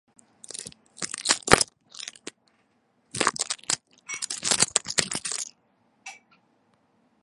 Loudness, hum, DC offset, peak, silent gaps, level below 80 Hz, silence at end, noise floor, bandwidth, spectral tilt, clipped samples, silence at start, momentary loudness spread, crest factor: -25 LUFS; none; under 0.1%; 0 dBFS; none; -54 dBFS; 1.1 s; -68 dBFS; 16 kHz; -1 dB/octave; under 0.1%; 0.5 s; 23 LU; 30 dB